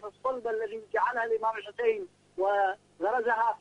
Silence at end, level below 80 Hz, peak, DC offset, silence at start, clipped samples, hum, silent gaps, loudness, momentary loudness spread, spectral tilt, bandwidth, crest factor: 0.05 s; -74 dBFS; -14 dBFS; under 0.1%; 0 s; under 0.1%; 50 Hz at -70 dBFS; none; -30 LUFS; 7 LU; -4.5 dB/octave; 10 kHz; 16 dB